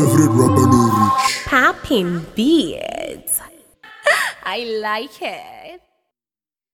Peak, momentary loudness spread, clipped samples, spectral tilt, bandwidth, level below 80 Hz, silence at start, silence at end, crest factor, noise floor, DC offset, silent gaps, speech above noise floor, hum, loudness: 0 dBFS; 14 LU; under 0.1%; -5 dB/octave; 19 kHz; -48 dBFS; 0 s; 0.95 s; 18 dB; under -90 dBFS; under 0.1%; none; over 74 dB; none; -17 LUFS